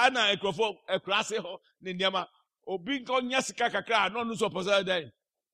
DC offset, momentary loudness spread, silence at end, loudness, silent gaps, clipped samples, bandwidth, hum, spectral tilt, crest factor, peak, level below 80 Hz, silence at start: under 0.1%; 13 LU; 0.45 s; -29 LUFS; none; under 0.1%; 14 kHz; none; -3 dB/octave; 20 dB; -10 dBFS; -72 dBFS; 0 s